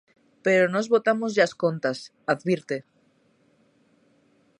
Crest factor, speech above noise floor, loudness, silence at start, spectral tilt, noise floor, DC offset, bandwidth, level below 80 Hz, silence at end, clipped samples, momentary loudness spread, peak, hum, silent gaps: 20 dB; 41 dB; -24 LUFS; 0.45 s; -5.5 dB/octave; -64 dBFS; under 0.1%; 10.5 kHz; -76 dBFS; 1.8 s; under 0.1%; 10 LU; -6 dBFS; none; none